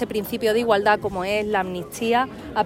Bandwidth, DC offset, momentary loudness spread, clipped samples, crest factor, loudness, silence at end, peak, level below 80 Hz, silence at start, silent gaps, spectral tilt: 16.5 kHz; under 0.1%; 7 LU; under 0.1%; 16 dB; -22 LUFS; 0 s; -6 dBFS; -50 dBFS; 0 s; none; -4.5 dB/octave